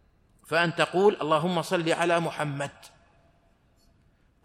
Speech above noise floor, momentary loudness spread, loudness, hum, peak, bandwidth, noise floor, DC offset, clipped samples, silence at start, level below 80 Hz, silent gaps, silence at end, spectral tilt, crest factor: 38 dB; 9 LU; -26 LUFS; none; -8 dBFS; 14.5 kHz; -64 dBFS; under 0.1%; under 0.1%; 0.5 s; -66 dBFS; none; 1.55 s; -5 dB/octave; 20 dB